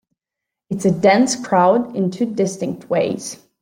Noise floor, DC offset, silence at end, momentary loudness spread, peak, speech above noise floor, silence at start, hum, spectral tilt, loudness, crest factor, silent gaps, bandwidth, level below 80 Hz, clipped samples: -84 dBFS; under 0.1%; 0.25 s; 13 LU; -2 dBFS; 67 dB; 0.7 s; none; -5.5 dB/octave; -18 LUFS; 16 dB; none; 15.5 kHz; -60 dBFS; under 0.1%